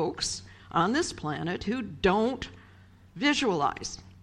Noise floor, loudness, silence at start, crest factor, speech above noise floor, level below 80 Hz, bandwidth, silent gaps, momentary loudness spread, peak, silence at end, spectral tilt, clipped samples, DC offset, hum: -54 dBFS; -29 LUFS; 0 s; 20 dB; 26 dB; -52 dBFS; 12 kHz; none; 13 LU; -10 dBFS; 0.05 s; -4 dB/octave; under 0.1%; under 0.1%; none